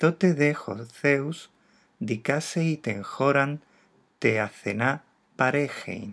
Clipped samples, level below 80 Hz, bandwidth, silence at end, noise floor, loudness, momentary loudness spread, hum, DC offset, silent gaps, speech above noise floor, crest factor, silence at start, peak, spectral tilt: under 0.1%; -76 dBFS; 11 kHz; 0 s; -62 dBFS; -26 LUFS; 12 LU; none; under 0.1%; none; 37 dB; 20 dB; 0 s; -6 dBFS; -6 dB/octave